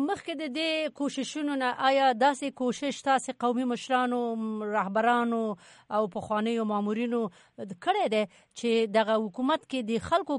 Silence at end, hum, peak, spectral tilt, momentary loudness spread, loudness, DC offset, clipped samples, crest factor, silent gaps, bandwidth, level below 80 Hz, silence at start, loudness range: 0 s; none; -12 dBFS; -4.5 dB/octave; 8 LU; -28 LUFS; under 0.1%; under 0.1%; 16 dB; none; 11 kHz; -68 dBFS; 0 s; 2 LU